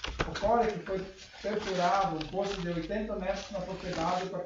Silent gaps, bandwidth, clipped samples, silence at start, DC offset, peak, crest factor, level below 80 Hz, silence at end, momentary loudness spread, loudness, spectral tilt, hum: none; 7.8 kHz; under 0.1%; 0 s; under 0.1%; -14 dBFS; 20 dB; -48 dBFS; 0 s; 10 LU; -32 LUFS; -5 dB/octave; none